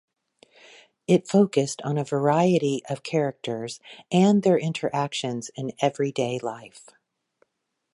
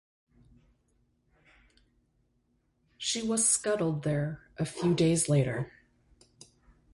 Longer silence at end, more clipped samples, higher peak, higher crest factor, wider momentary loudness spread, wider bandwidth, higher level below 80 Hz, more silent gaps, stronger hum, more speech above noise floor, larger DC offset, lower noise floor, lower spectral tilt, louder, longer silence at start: about the same, 1.15 s vs 1.25 s; neither; first, -6 dBFS vs -14 dBFS; about the same, 18 dB vs 18 dB; about the same, 13 LU vs 12 LU; about the same, 11.5 kHz vs 11.5 kHz; second, -72 dBFS vs -62 dBFS; neither; neither; first, 55 dB vs 45 dB; neither; first, -79 dBFS vs -73 dBFS; first, -6 dB/octave vs -4.5 dB/octave; first, -24 LUFS vs -29 LUFS; second, 1.1 s vs 3 s